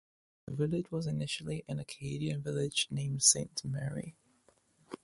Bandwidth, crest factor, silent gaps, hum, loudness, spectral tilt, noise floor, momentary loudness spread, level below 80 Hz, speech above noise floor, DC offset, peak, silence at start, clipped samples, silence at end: 11.5 kHz; 24 dB; none; none; -33 LUFS; -3.5 dB/octave; -69 dBFS; 18 LU; -64 dBFS; 35 dB; under 0.1%; -12 dBFS; 0.45 s; under 0.1%; 0.1 s